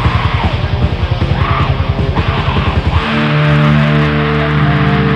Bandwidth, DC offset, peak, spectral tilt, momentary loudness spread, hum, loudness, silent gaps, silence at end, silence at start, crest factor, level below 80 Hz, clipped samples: 6.6 kHz; under 0.1%; 0 dBFS; -8 dB/octave; 5 LU; none; -13 LUFS; none; 0 s; 0 s; 12 dB; -20 dBFS; under 0.1%